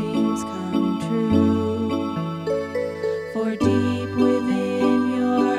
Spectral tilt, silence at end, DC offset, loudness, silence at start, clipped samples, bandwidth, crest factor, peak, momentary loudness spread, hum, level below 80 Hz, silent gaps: -7 dB/octave; 0 s; under 0.1%; -22 LUFS; 0 s; under 0.1%; 12.5 kHz; 16 dB; -6 dBFS; 6 LU; none; -54 dBFS; none